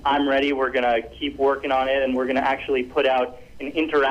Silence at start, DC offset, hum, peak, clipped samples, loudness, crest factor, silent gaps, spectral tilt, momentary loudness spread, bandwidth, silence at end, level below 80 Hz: 0 s; under 0.1%; none; -12 dBFS; under 0.1%; -22 LUFS; 10 dB; none; -5.5 dB/octave; 6 LU; 9.4 kHz; 0 s; -48 dBFS